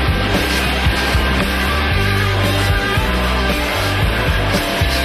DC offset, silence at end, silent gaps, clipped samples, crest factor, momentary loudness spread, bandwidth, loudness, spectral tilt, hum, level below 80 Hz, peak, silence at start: under 0.1%; 0 s; none; under 0.1%; 12 dB; 1 LU; 13.5 kHz; -16 LUFS; -4.5 dB/octave; none; -22 dBFS; -2 dBFS; 0 s